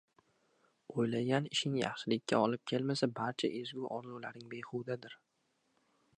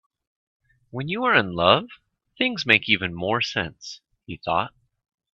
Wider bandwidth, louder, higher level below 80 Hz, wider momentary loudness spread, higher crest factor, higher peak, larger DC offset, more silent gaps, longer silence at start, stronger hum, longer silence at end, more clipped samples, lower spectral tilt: first, 10.5 kHz vs 8.4 kHz; second, -36 LUFS vs -22 LUFS; second, -80 dBFS vs -58 dBFS; second, 13 LU vs 21 LU; about the same, 22 dB vs 24 dB; second, -16 dBFS vs 0 dBFS; neither; neither; about the same, 0.9 s vs 0.95 s; neither; first, 1.05 s vs 0.65 s; neither; about the same, -5 dB/octave vs -4.5 dB/octave